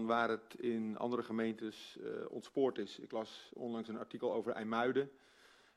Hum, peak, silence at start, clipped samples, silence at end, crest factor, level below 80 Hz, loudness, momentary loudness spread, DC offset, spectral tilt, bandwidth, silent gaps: none; -20 dBFS; 0 s; under 0.1%; 0.65 s; 20 dB; -82 dBFS; -40 LUFS; 11 LU; under 0.1%; -6 dB/octave; 12.5 kHz; none